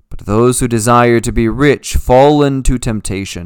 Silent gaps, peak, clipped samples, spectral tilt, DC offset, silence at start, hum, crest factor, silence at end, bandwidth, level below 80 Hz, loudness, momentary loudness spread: none; 0 dBFS; 0.6%; -5.5 dB/octave; under 0.1%; 0.1 s; none; 12 dB; 0 s; 19 kHz; -22 dBFS; -12 LUFS; 9 LU